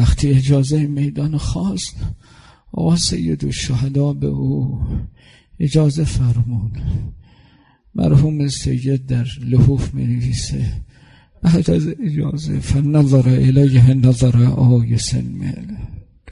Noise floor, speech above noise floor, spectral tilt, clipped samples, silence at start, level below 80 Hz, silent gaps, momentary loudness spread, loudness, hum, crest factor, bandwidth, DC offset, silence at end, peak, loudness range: -51 dBFS; 36 dB; -7 dB/octave; under 0.1%; 0 s; -30 dBFS; none; 13 LU; -17 LUFS; none; 14 dB; 11 kHz; under 0.1%; 0 s; -2 dBFS; 6 LU